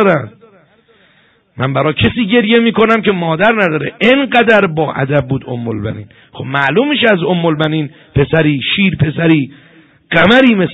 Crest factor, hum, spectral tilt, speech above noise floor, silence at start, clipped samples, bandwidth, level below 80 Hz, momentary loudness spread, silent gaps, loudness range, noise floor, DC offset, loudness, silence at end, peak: 12 dB; none; -8 dB/octave; 40 dB; 0 s; under 0.1%; 7.8 kHz; -40 dBFS; 11 LU; none; 3 LU; -51 dBFS; under 0.1%; -12 LUFS; 0 s; 0 dBFS